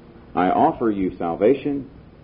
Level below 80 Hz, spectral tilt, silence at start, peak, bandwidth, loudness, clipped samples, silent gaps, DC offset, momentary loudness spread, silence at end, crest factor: -48 dBFS; -12 dB/octave; 0.3 s; -6 dBFS; 5 kHz; -21 LUFS; under 0.1%; none; under 0.1%; 11 LU; 0.35 s; 16 dB